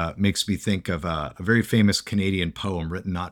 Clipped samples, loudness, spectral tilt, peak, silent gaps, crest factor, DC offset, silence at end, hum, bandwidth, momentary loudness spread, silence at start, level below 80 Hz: under 0.1%; -24 LUFS; -5 dB/octave; -6 dBFS; none; 18 dB; under 0.1%; 0 s; none; 17.5 kHz; 9 LU; 0 s; -44 dBFS